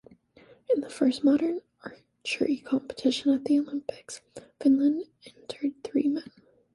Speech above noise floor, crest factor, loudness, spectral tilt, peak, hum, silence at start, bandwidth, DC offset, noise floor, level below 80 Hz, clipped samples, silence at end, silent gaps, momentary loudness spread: 30 dB; 16 dB; -27 LUFS; -4.5 dB/octave; -12 dBFS; none; 0.7 s; 11.5 kHz; under 0.1%; -57 dBFS; -70 dBFS; under 0.1%; 0.55 s; none; 19 LU